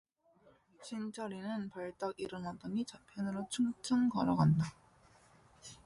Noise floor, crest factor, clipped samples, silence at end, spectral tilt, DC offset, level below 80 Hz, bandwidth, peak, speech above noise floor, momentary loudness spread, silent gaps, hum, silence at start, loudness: -68 dBFS; 18 dB; under 0.1%; 0.1 s; -6.5 dB/octave; under 0.1%; -66 dBFS; 11.5 kHz; -20 dBFS; 32 dB; 14 LU; none; none; 0.8 s; -37 LUFS